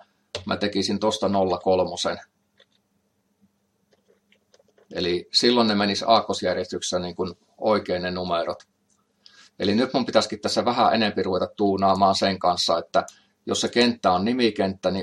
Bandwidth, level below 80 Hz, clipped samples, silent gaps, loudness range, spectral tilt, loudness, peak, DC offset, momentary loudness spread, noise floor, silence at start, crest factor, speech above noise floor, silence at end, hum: 12.5 kHz; -66 dBFS; under 0.1%; none; 6 LU; -4.5 dB/octave; -23 LUFS; -4 dBFS; under 0.1%; 9 LU; -70 dBFS; 0.35 s; 20 dB; 47 dB; 0 s; none